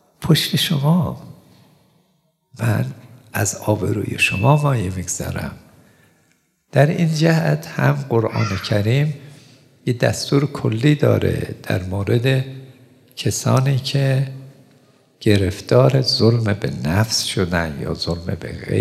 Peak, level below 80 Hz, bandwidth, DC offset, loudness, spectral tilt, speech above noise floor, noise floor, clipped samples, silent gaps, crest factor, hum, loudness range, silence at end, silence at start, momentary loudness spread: 0 dBFS; -50 dBFS; 14.5 kHz; under 0.1%; -19 LUFS; -5.5 dB/octave; 46 dB; -64 dBFS; under 0.1%; none; 18 dB; none; 3 LU; 0 s; 0.2 s; 11 LU